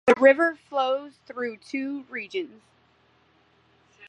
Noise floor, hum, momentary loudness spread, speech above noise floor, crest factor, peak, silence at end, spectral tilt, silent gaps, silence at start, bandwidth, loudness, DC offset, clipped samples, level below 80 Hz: -63 dBFS; none; 16 LU; 38 dB; 22 dB; -4 dBFS; 1.6 s; -4.5 dB/octave; none; 0.05 s; 9.4 kHz; -25 LUFS; under 0.1%; under 0.1%; -74 dBFS